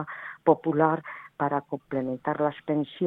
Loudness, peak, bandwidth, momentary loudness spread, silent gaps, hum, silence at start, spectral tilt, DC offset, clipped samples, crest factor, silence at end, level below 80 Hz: -27 LUFS; -6 dBFS; 4 kHz; 9 LU; none; none; 0 s; -10 dB/octave; under 0.1%; under 0.1%; 22 dB; 0 s; -70 dBFS